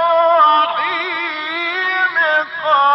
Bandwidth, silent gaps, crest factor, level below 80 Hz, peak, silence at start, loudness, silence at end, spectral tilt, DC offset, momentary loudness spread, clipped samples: 6.2 kHz; none; 12 dB; -72 dBFS; -4 dBFS; 0 s; -15 LUFS; 0 s; -3 dB/octave; under 0.1%; 9 LU; under 0.1%